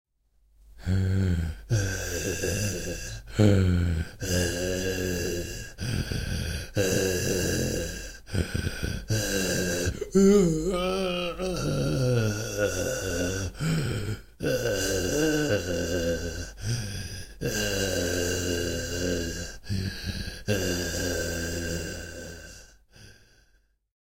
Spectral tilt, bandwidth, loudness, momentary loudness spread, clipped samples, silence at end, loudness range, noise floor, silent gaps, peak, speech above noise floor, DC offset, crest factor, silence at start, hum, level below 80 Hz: -4.5 dB/octave; 16 kHz; -28 LUFS; 9 LU; under 0.1%; 0.65 s; 5 LU; -65 dBFS; none; -6 dBFS; 43 dB; 0.2%; 22 dB; 0.65 s; none; -40 dBFS